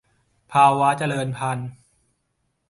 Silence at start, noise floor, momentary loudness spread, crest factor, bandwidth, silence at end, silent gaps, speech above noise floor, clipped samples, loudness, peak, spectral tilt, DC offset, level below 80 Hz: 0.5 s; -72 dBFS; 13 LU; 20 dB; 11.5 kHz; 0.95 s; none; 53 dB; under 0.1%; -20 LUFS; -2 dBFS; -5.5 dB/octave; under 0.1%; -62 dBFS